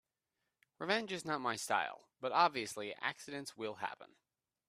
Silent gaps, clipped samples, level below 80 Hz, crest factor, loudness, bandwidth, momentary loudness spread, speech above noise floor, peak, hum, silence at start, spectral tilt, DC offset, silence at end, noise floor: none; under 0.1%; -84 dBFS; 24 dB; -38 LUFS; 15.5 kHz; 13 LU; 50 dB; -16 dBFS; none; 0.8 s; -3 dB/octave; under 0.1%; 0.6 s; -88 dBFS